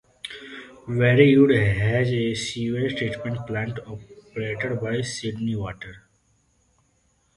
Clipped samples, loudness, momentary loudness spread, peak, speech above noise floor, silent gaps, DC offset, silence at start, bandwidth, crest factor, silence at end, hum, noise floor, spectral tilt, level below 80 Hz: under 0.1%; -23 LUFS; 22 LU; -2 dBFS; 43 dB; none; under 0.1%; 0.25 s; 11.5 kHz; 22 dB; 1.4 s; none; -66 dBFS; -6.5 dB/octave; -50 dBFS